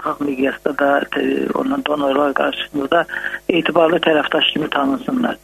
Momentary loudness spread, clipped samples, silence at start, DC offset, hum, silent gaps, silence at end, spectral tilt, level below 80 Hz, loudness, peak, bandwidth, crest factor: 5 LU; under 0.1%; 0 s; under 0.1%; none; none; 0.05 s; -5.5 dB/octave; -52 dBFS; -17 LUFS; 0 dBFS; 13.5 kHz; 18 dB